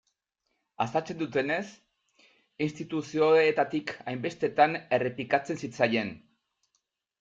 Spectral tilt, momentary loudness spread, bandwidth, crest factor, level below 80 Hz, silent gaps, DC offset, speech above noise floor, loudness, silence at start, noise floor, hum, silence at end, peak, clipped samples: -5.5 dB/octave; 11 LU; 7.8 kHz; 22 dB; -72 dBFS; none; under 0.1%; 52 dB; -28 LUFS; 0.8 s; -80 dBFS; none; 1.05 s; -8 dBFS; under 0.1%